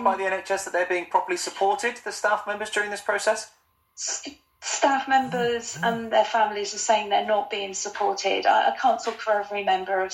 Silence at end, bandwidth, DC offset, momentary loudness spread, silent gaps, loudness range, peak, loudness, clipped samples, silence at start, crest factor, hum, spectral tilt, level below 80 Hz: 0 s; 16.5 kHz; under 0.1%; 8 LU; none; 3 LU; -6 dBFS; -24 LUFS; under 0.1%; 0 s; 18 dB; none; -2 dB/octave; -70 dBFS